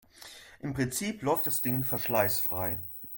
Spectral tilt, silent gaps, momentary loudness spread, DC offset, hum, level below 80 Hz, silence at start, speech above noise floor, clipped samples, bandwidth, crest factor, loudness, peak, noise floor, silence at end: -4.5 dB/octave; none; 17 LU; under 0.1%; none; -60 dBFS; 0.15 s; 21 dB; under 0.1%; 17 kHz; 20 dB; -29 LUFS; -12 dBFS; -51 dBFS; 0 s